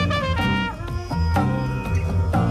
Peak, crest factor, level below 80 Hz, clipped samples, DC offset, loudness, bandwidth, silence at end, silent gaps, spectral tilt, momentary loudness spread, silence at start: -10 dBFS; 12 dB; -30 dBFS; under 0.1%; under 0.1%; -23 LUFS; 13.5 kHz; 0 s; none; -7 dB/octave; 6 LU; 0 s